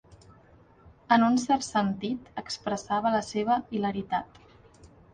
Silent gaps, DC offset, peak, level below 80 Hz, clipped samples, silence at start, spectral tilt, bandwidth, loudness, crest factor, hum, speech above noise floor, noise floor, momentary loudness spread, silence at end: none; under 0.1%; -6 dBFS; -60 dBFS; under 0.1%; 0.1 s; -5 dB/octave; 9.6 kHz; -28 LUFS; 22 dB; none; 29 dB; -57 dBFS; 11 LU; 0.3 s